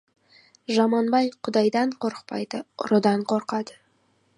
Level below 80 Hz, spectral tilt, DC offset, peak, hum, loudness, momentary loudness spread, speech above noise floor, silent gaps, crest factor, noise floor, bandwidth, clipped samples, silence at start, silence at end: -74 dBFS; -6 dB/octave; under 0.1%; -6 dBFS; none; -24 LUFS; 11 LU; 42 dB; none; 18 dB; -66 dBFS; 11 kHz; under 0.1%; 0.7 s; 0.65 s